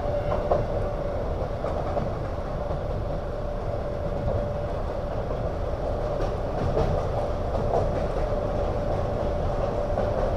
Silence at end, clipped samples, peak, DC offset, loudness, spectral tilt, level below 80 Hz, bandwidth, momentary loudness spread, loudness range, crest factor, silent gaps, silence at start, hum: 0 s; under 0.1%; -8 dBFS; 0.8%; -28 LUFS; -8 dB/octave; -32 dBFS; 8.8 kHz; 5 LU; 3 LU; 18 dB; none; 0 s; none